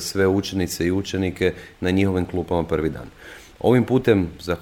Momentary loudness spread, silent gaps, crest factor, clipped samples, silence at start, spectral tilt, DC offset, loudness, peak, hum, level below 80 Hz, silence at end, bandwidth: 10 LU; none; 18 dB; under 0.1%; 0 s; -6 dB/octave; under 0.1%; -22 LUFS; -2 dBFS; none; -44 dBFS; 0 s; 18 kHz